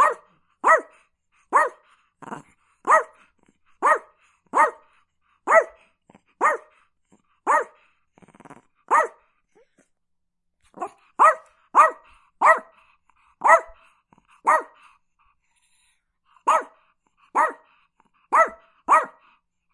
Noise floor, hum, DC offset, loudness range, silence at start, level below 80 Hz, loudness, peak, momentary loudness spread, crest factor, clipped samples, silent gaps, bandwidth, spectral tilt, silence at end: -74 dBFS; none; under 0.1%; 7 LU; 0 s; -70 dBFS; -21 LUFS; 0 dBFS; 19 LU; 24 dB; under 0.1%; none; 11.5 kHz; -2 dB/octave; 0.65 s